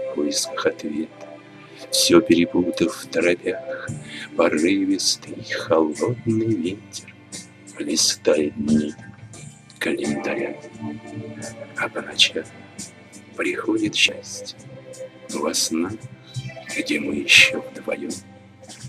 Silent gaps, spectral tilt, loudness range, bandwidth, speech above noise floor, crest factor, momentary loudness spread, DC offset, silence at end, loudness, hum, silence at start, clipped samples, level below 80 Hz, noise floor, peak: none; -3 dB/octave; 5 LU; 15.5 kHz; 22 dB; 24 dB; 20 LU; under 0.1%; 0 s; -21 LUFS; none; 0 s; under 0.1%; -60 dBFS; -44 dBFS; 0 dBFS